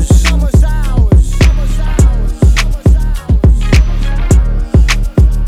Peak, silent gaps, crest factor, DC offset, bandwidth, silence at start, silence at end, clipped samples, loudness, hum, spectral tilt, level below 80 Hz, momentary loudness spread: 0 dBFS; none; 8 dB; under 0.1%; 13.5 kHz; 0 s; 0 s; 0.4%; -11 LUFS; none; -6 dB/octave; -10 dBFS; 4 LU